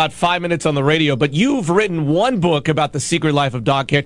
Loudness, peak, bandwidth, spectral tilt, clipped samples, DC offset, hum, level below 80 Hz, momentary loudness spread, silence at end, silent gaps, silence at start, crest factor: -17 LUFS; -2 dBFS; 11.5 kHz; -5.5 dB/octave; under 0.1%; under 0.1%; none; -48 dBFS; 3 LU; 0 s; none; 0 s; 16 dB